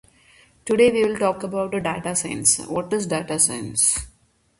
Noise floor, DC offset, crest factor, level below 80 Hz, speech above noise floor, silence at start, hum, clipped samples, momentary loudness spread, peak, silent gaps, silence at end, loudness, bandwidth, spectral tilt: -54 dBFS; under 0.1%; 18 dB; -50 dBFS; 33 dB; 0.65 s; none; under 0.1%; 8 LU; -4 dBFS; none; 0.5 s; -21 LUFS; 12 kHz; -3 dB/octave